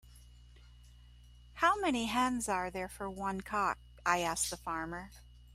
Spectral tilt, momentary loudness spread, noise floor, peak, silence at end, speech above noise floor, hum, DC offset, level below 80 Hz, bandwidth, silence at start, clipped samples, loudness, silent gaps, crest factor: -3 dB/octave; 11 LU; -57 dBFS; -14 dBFS; 0 s; 22 dB; 60 Hz at -55 dBFS; under 0.1%; -56 dBFS; 16 kHz; 0.05 s; under 0.1%; -34 LUFS; none; 22 dB